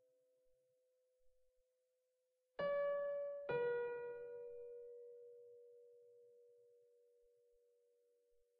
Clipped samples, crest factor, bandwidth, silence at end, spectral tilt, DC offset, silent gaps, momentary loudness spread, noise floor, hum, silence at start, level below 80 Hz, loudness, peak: under 0.1%; 18 dB; 4.8 kHz; 1.95 s; -3 dB/octave; under 0.1%; none; 23 LU; -86 dBFS; none; 1.25 s; -86 dBFS; -44 LUFS; -30 dBFS